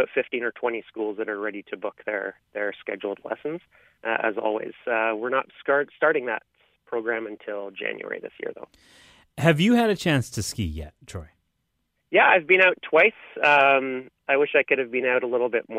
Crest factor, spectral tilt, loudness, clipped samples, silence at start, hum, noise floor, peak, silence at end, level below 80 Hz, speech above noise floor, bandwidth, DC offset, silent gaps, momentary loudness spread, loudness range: 20 dB; -5 dB/octave; -23 LUFS; under 0.1%; 0 s; none; -75 dBFS; -6 dBFS; 0 s; -52 dBFS; 51 dB; 15.5 kHz; under 0.1%; none; 17 LU; 10 LU